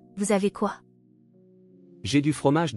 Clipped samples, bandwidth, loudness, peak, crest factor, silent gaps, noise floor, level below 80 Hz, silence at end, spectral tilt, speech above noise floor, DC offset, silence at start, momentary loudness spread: under 0.1%; 12 kHz; -25 LUFS; -8 dBFS; 18 dB; none; -58 dBFS; -64 dBFS; 0 s; -5.5 dB/octave; 34 dB; under 0.1%; 0.15 s; 12 LU